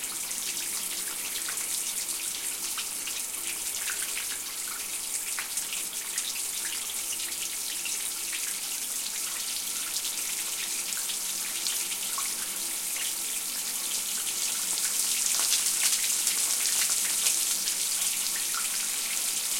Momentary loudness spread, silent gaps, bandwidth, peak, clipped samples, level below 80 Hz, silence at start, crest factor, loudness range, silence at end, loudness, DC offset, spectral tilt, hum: 7 LU; none; 17 kHz; -6 dBFS; under 0.1%; -68 dBFS; 0 s; 24 dB; 6 LU; 0 s; -27 LUFS; under 0.1%; 2.5 dB/octave; none